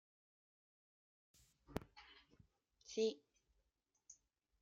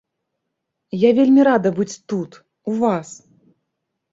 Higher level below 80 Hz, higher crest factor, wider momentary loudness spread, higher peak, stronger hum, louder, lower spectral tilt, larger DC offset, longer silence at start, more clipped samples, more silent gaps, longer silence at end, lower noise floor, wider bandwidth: second, -74 dBFS vs -64 dBFS; first, 26 dB vs 16 dB; first, 24 LU vs 19 LU; second, -26 dBFS vs -4 dBFS; neither; second, -45 LUFS vs -18 LUFS; second, -4.5 dB/octave vs -6.5 dB/octave; neither; first, 1.7 s vs 0.95 s; neither; neither; second, 0.5 s vs 1 s; first, -86 dBFS vs -78 dBFS; first, 14 kHz vs 7.8 kHz